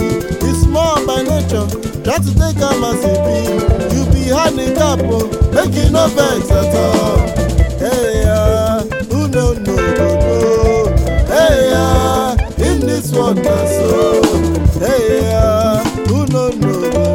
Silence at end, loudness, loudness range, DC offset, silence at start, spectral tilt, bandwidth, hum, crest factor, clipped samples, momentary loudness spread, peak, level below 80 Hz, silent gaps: 0 s; -13 LUFS; 2 LU; under 0.1%; 0 s; -6 dB/octave; 17 kHz; none; 12 dB; under 0.1%; 4 LU; 0 dBFS; -20 dBFS; none